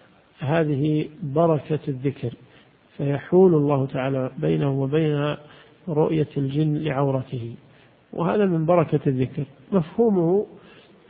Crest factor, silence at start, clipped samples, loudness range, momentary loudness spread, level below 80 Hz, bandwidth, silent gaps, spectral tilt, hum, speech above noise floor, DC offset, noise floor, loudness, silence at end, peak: 18 dB; 0.4 s; under 0.1%; 3 LU; 13 LU; -56 dBFS; 4.7 kHz; none; -13 dB/octave; none; 32 dB; under 0.1%; -54 dBFS; -23 LUFS; 0.5 s; -6 dBFS